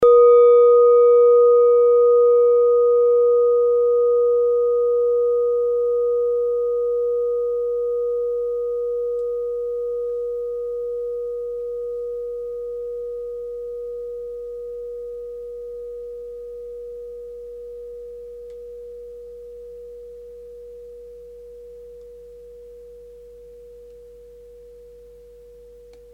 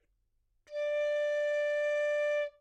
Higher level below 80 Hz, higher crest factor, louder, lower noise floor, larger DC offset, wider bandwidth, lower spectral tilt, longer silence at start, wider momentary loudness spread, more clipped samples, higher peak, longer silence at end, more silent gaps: first, -54 dBFS vs -74 dBFS; first, 14 dB vs 8 dB; first, -18 LUFS vs -32 LUFS; second, -45 dBFS vs -75 dBFS; neither; second, 2.4 kHz vs 8.8 kHz; first, -6.5 dB/octave vs 1 dB/octave; second, 0 s vs 0.7 s; first, 25 LU vs 5 LU; neither; first, -6 dBFS vs -24 dBFS; first, 1.45 s vs 0.1 s; neither